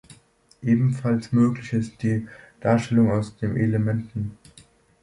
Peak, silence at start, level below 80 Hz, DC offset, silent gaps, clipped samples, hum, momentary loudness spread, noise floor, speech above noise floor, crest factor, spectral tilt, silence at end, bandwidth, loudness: -6 dBFS; 0.6 s; -52 dBFS; under 0.1%; none; under 0.1%; none; 11 LU; -56 dBFS; 34 dB; 16 dB; -8.5 dB/octave; 0.7 s; 11 kHz; -23 LUFS